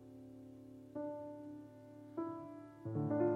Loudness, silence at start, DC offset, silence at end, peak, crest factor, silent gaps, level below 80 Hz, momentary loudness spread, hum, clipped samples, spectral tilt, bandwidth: -45 LUFS; 0 s; under 0.1%; 0 s; -24 dBFS; 20 dB; none; -80 dBFS; 16 LU; none; under 0.1%; -10.5 dB/octave; 6.6 kHz